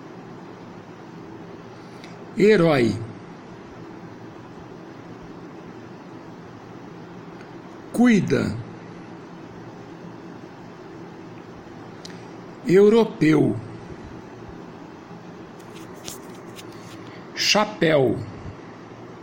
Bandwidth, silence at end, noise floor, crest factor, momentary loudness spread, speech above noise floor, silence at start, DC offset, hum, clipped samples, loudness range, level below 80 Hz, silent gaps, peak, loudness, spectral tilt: 16.5 kHz; 0 s; -40 dBFS; 20 dB; 23 LU; 23 dB; 0.05 s; under 0.1%; none; under 0.1%; 18 LU; -56 dBFS; none; -6 dBFS; -20 LUFS; -5.5 dB/octave